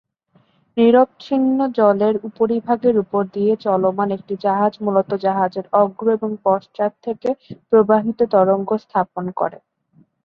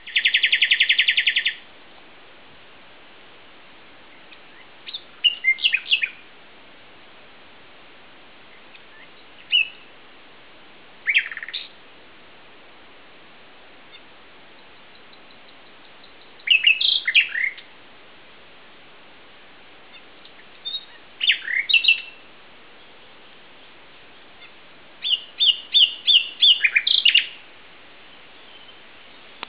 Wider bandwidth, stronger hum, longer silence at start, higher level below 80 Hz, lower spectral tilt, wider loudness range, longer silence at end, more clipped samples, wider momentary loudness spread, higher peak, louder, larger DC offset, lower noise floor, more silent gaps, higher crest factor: first, 5.8 kHz vs 4 kHz; neither; first, 0.75 s vs 0.05 s; first, -62 dBFS vs -70 dBFS; first, -9.5 dB/octave vs 5.5 dB/octave; second, 2 LU vs 14 LU; second, 0.7 s vs 2.1 s; neither; second, 9 LU vs 18 LU; about the same, -2 dBFS vs -2 dBFS; about the same, -18 LUFS vs -17 LUFS; second, under 0.1% vs 0.4%; first, -59 dBFS vs -48 dBFS; neither; second, 16 dB vs 24 dB